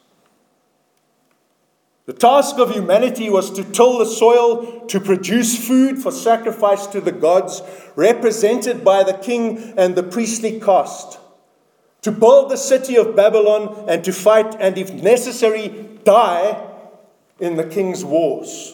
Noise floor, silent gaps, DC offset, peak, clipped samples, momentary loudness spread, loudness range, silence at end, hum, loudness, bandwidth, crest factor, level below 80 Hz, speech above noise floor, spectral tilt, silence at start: -64 dBFS; none; under 0.1%; 0 dBFS; under 0.1%; 11 LU; 3 LU; 0 s; none; -16 LUFS; 19 kHz; 16 dB; -72 dBFS; 48 dB; -4 dB/octave; 2.1 s